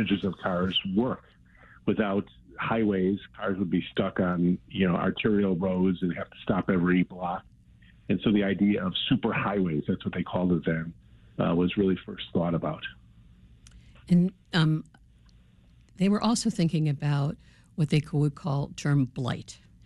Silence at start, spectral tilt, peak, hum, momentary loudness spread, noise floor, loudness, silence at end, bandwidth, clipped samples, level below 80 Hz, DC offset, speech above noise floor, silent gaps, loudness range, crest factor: 0 s; -6.5 dB/octave; -12 dBFS; none; 8 LU; -57 dBFS; -27 LUFS; 0.3 s; 11.5 kHz; under 0.1%; -54 dBFS; under 0.1%; 31 dB; none; 3 LU; 16 dB